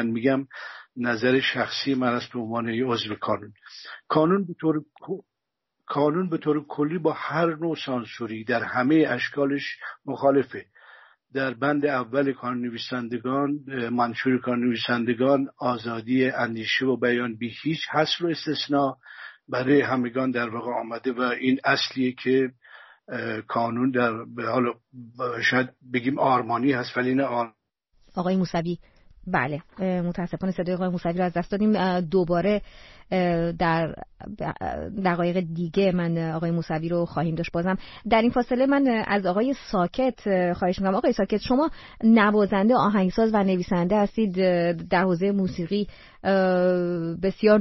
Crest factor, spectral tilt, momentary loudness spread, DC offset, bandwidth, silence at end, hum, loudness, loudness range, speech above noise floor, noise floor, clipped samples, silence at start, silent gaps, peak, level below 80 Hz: 18 dB; -4.5 dB/octave; 10 LU; under 0.1%; 6.2 kHz; 0 s; none; -24 LUFS; 5 LU; 57 dB; -81 dBFS; under 0.1%; 0 s; none; -6 dBFS; -52 dBFS